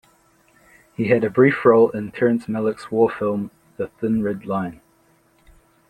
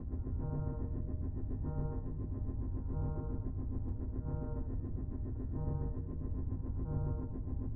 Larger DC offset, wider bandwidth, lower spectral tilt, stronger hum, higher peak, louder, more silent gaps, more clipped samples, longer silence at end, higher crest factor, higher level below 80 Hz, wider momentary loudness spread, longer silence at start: neither; first, 10 kHz vs 2.1 kHz; second, -8.5 dB/octave vs -12 dB/octave; neither; first, -2 dBFS vs -24 dBFS; first, -20 LUFS vs -40 LUFS; neither; neither; first, 1.15 s vs 0 s; first, 18 dB vs 12 dB; second, -58 dBFS vs -40 dBFS; first, 16 LU vs 3 LU; first, 1 s vs 0 s